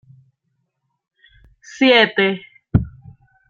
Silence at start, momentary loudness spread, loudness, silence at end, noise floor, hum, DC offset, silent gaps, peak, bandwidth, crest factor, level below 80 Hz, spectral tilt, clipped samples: 1.75 s; 15 LU; -16 LUFS; 0.6 s; -72 dBFS; none; under 0.1%; none; -2 dBFS; 7.6 kHz; 20 dB; -42 dBFS; -6 dB/octave; under 0.1%